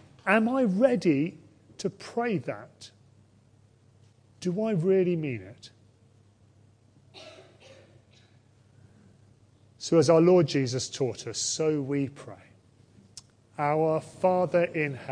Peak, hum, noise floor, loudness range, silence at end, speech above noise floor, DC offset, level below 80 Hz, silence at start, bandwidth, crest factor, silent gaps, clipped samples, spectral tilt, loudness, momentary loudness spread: -6 dBFS; none; -60 dBFS; 9 LU; 0 s; 34 dB; under 0.1%; -72 dBFS; 0.25 s; 10.5 kHz; 22 dB; none; under 0.1%; -5.5 dB/octave; -26 LUFS; 25 LU